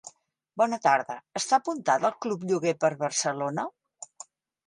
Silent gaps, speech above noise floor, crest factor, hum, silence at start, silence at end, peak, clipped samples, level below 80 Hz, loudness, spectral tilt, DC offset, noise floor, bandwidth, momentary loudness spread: none; 29 dB; 20 dB; none; 0.05 s; 0.6 s; -8 dBFS; under 0.1%; -78 dBFS; -27 LUFS; -3.5 dB/octave; under 0.1%; -55 dBFS; 11.5 kHz; 19 LU